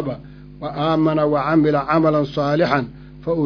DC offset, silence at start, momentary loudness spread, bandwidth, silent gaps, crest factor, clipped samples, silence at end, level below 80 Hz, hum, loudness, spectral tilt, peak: under 0.1%; 0 s; 15 LU; 5.4 kHz; none; 18 dB; under 0.1%; 0 s; -46 dBFS; none; -18 LUFS; -8.5 dB/octave; -2 dBFS